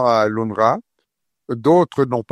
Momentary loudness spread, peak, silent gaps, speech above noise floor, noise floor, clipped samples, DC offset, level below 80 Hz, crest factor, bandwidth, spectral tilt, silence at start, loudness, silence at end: 9 LU; -2 dBFS; none; 57 dB; -74 dBFS; under 0.1%; under 0.1%; -60 dBFS; 16 dB; 12.5 kHz; -7 dB/octave; 0 s; -18 LUFS; 0.1 s